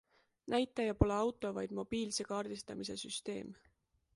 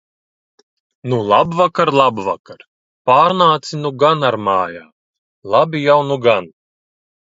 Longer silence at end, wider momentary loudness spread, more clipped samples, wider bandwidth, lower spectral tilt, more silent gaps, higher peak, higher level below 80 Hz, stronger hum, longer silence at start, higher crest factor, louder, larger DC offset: second, 0.6 s vs 0.9 s; about the same, 11 LU vs 11 LU; neither; first, 11.5 kHz vs 7.8 kHz; about the same, -5 dB/octave vs -6 dB/octave; second, none vs 2.39-2.44 s, 2.68-3.05 s, 4.92-5.42 s; second, -14 dBFS vs 0 dBFS; first, -50 dBFS vs -58 dBFS; neither; second, 0.45 s vs 1.05 s; first, 24 dB vs 16 dB; second, -38 LUFS vs -15 LUFS; neither